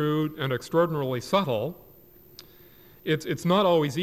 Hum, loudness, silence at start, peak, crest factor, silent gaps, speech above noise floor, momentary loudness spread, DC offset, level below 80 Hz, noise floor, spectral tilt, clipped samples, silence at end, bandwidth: none; -26 LUFS; 0 s; -12 dBFS; 16 dB; none; 28 dB; 8 LU; under 0.1%; -62 dBFS; -53 dBFS; -6 dB/octave; under 0.1%; 0 s; 15 kHz